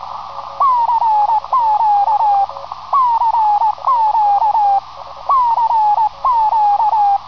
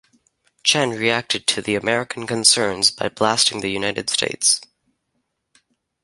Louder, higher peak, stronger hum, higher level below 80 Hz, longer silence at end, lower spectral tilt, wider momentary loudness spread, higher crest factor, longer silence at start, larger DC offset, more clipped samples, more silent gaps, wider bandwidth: first, -14 LUFS vs -18 LUFS; second, -6 dBFS vs 0 dBFS; first, 60 Hz at -50 dBFS vs none; first, -50 dBFS vs -58 dBFS; second, 0 s vs 1.4 s; first, -3.5 dB/octave vs -1.5 dB/octave; about the same, 6 LU vs 8 LU; second, 8 dB vs 22 dB; second, 0 s vs 0.65 s; first, 0.9% vs under 0.1%; neither; neither; second, 5.4 kHz vs 12 kHz